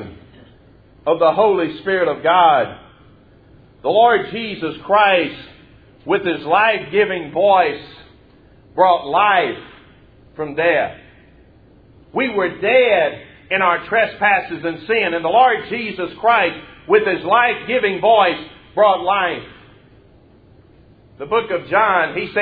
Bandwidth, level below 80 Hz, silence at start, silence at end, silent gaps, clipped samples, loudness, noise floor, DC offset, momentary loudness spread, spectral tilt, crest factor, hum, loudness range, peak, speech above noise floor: 5 kHz; -54 dBFS; 0 s; 0 s; none; under 0.1%; -16 LUFS; -48 dBFS; under 0.1%; 13 LU; -8 dB/octave; 18 dB; none; 4 LU; 0 dBFS; 32 dB